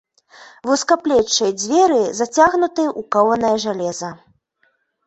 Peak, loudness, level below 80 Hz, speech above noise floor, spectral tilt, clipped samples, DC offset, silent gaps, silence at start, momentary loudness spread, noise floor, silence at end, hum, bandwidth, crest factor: -2 dBFS; -17 LUFS; -56 dBFS; 47 dB; -3 dB/octave; under 0.1%; under 0.1%; none; 0.4 s; 9 LU; -64 dBFS; 0.9 s; none; 8.2 kHz; 16 dB